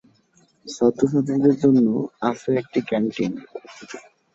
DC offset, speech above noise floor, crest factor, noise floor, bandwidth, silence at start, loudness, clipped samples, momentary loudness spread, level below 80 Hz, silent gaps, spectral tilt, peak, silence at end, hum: under 0.1%; 39 dB; 18 dB; -60 dBFS; 7.8 kHz; 0.65 s; -21 LUFS; under 0.1%; 22 LU; -62 dBFS; none; -7 dB/octave; -4 dBFS; 0.35 s; none